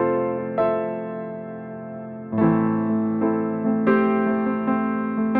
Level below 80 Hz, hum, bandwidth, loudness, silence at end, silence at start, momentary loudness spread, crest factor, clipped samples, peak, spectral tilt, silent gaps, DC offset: -62 dBFS; none; 4 kHz; -22 LUFS; 0 s; 0 s; 15 LU; 16 dB; under 0.1%; -8 dBFS; -11.5 dB/octave; none; under 0.1%